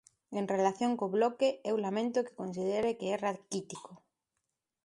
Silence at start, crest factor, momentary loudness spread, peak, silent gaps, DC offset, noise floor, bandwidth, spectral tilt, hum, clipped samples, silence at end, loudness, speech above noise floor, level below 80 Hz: 0.3 s; 18 dB; 10 LU; -16 dBFS; none; under 0.1%; -86 dBFS; 11.5 kHz; -5.5 dB/octave; none; under 0.1%; 0.9 s; -33 LUFS; 53 dB; -76 dBFS